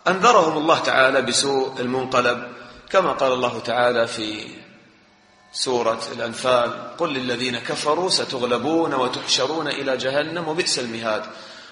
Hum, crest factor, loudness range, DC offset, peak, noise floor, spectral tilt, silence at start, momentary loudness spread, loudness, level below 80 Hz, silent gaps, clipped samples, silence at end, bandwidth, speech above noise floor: none; 20 dB; 4 LU; under 0.1%; -2 dBFS; -54 dBFS; -3 dB/octave; 0.05 s; 11 LU; -21 LUFS; -62 dBFS; none; under 0.1%; 0 s; 10.5 kHz; 33 dB